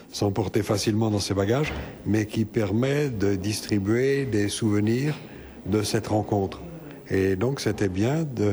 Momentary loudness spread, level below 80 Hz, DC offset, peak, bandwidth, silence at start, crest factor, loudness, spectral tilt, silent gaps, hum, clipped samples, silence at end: 6 LU; -50 dBFS; under 0.1%; -10 dBFS; over 20 kHz; 0 s; 14 dB; -25 LUFS; -6 dB/octave; none; none; under 0.1%; 0 s